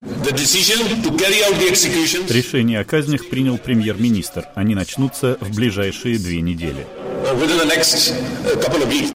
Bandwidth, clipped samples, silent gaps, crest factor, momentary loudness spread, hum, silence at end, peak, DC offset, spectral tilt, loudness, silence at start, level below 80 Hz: 16 kHz; under 0.1%; none; 16 dB; 9 LU; none; 0 s; -2 dBFS; under 0.1%; -3.5 dB/octave; -17 LUFS; 0 s; -42 dBFS